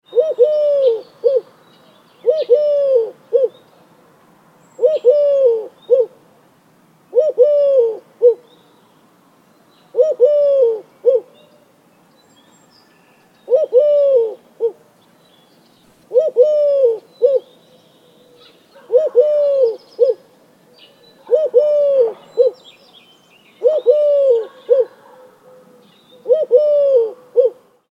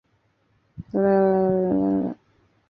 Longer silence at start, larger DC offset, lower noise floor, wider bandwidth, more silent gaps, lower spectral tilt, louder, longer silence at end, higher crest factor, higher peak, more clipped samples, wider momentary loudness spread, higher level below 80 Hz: second, 0.1 s vs 0.8 s; neither; second, -52 dBFS vs -66 dBFS; first, 5.8 kHz vs 4.8 kHz; neither; second, -5 dB/octave vs -12 dB/octave; first, -15 LUFS vs -22 LUFS; second, 0.4 s vs 0.55 s; about the same, 16 dB vs 16 dB; first, -2 dBFS vs -8 dBFS; neither; second, 7 LU vs 17 LU; second, -82 dBFS vs -56 dBFS